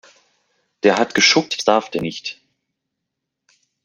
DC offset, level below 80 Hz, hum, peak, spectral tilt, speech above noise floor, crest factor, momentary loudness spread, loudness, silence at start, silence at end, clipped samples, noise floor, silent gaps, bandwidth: under 0.1%; -62 dBFS; none; 0 dBFS; -2.5 dB/octave; 62 dB; 20 dB; 14 LU; -17 LUFS; 0.85 s; 1.55 s; under 0.1%; -80 dBFS; none; 14 kHz